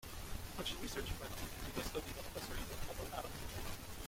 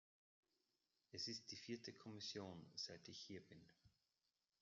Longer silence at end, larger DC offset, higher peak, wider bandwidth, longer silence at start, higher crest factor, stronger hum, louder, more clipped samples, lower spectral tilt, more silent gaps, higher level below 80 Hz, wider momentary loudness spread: second, 0 s vs 0.7 s; neither; first, -26 dBFS vs -38 dBFS; first, 16.5 kHz vs 7.4 kHz; second, 0 s vs 1.15 s; about the same, 18 dB vs 20 dB; neither; first, -45 LUFS vs -53 LUFS; neither; about the same, -3.5 dB/octave vs -3 dB/octave; neither; first, -50 dBFS vs under -90 dBFS; second, 4 LU vs 10 LU